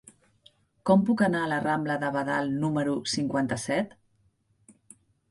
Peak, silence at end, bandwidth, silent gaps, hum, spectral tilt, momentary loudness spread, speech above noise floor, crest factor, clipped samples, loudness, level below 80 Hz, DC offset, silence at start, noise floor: -10 dBFS; 1.45 s; 11.5 kHz; none; none; -5.5 dB/octave; 6 LU; 42 dB; 18 dB; under 0.1%; -27 LUFS; -64 dBFS; under 0.1%; 0.85 s; -68 dBFS